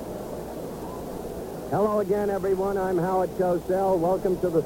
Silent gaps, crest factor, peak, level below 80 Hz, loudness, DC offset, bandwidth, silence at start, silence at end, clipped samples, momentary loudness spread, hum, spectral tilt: none; 16 dB; -10 dBFS; -48 dBFS; -26 LUFS; under 0.1%; 17 kHz; 0 s; 0 s; under 0.1%; 11 LU; none; -7.5 dB/octave